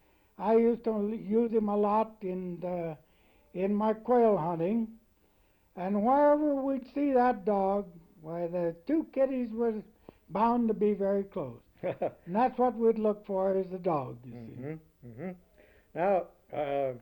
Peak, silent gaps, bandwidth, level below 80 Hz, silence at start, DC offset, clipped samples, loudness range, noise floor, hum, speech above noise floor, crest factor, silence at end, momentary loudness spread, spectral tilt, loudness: -16 dBFS; none; 18.5 kHz; -64 dBFS; 0.4 s; under 0.1%; under 0.1%; 4 LU; -67 dBFS; none; 38 dB; 14 dB; 0.05 s; 17 LU; -9.5 dB/octave; -30 LUFS